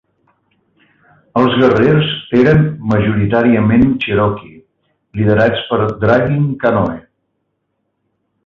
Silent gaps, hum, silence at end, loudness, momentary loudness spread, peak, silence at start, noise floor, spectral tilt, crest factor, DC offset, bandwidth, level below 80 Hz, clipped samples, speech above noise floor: none; none; 1.45 s; -13 LUFS; 7 LU; 0 dBFS; 1.35 s; -69 dBFS; -9 dB/octave; 14 dB; under 0.1%; 6.6 kHz; -40 dBFS; under 0.1%; 57 dB